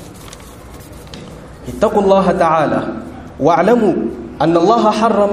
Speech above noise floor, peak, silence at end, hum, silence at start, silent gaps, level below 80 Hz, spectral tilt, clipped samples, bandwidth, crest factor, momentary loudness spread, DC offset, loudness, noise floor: 22 dB; 0 dBFS; 0 s; none; 0 s; none; -40 dBFS; -6.5 dB/octave; under 0.1%; 15 kHz; 14 dB; 23 LU; under 0.1%; -13 LUFS; -34 dBFS